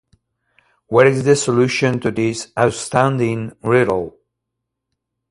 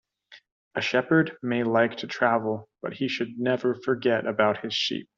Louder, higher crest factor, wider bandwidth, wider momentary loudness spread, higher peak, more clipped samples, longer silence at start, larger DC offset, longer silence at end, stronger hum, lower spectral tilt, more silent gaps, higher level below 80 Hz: first, -17 LUFS vs -26 LUFS; about the same, 18 dB vs 20 dB; first, 11.5 kHz vs 7.6 kHz; about the same, 8 LU vs 8 LU; first, 0 dBFS vs -6 dBFS; neither; first, 0.9 s vs 0.3 s; neither; first, 1.2 s vs 0.15 s; neither; first, -5.5 dB/octave vs -3.5 dB/octave; second, none vs 0.52-0.71 s; first, -52 dBFS vs -72 dBFS